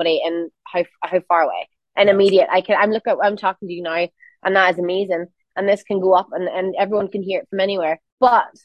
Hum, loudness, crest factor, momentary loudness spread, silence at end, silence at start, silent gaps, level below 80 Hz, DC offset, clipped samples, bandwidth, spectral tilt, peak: none; -19 LUFS; 18 dB; 10 LU; 0.15 s; 0 s; 8.12-8.18 s; -66 dBFS; under 0.1%; under 0.1%; 9 kHz; -6 dB/octave; -2 dBFS